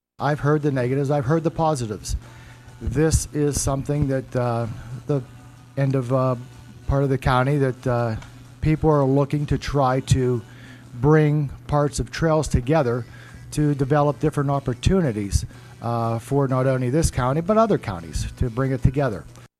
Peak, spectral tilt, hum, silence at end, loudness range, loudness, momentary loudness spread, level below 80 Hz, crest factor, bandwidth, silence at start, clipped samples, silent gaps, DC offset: -2 dBFS; -6.5 dB/octave; none; 0.15 s; 3 LU; -22 LUFS; 12 LU; -36 dBFS; 20 dB; 13.5 kHz; 0.2 s; under 0.1%; none; under 0.1%